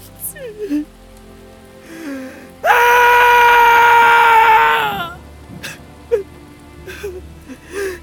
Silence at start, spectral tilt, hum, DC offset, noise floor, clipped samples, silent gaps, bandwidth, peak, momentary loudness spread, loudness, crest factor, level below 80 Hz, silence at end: 0.2 s; -2.5 dB/octave; none; under 0.1%; -40 dBFS; 0.1%; none; 19.5 kHz; 0 dBFS; 22 LU; -11 LUFS; 14 dB; -44 dBFS; 0.05 s